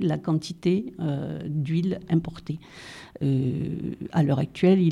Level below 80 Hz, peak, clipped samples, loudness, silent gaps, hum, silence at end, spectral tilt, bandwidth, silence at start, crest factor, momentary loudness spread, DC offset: -56 dBFS; -8 dBFS; under 0.1%; -26 LUFS; none; none; 0 s; -8 dB/octave; 11 kHz; 0 s; 16 dB; 13 LU; under 0.1%